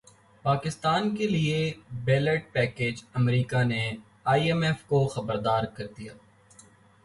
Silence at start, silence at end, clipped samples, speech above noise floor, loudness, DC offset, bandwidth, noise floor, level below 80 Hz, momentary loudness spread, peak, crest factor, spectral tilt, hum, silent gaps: 0.45 s; 0.9 s; under 0.1%; 29 dB; -27 LUFS; under 0.1%; 11.5 kHz; -56 dBFS; -56 dBFS; 9 LU; -10 dBFS; 16 dB; -6.5 dB/octave; none; none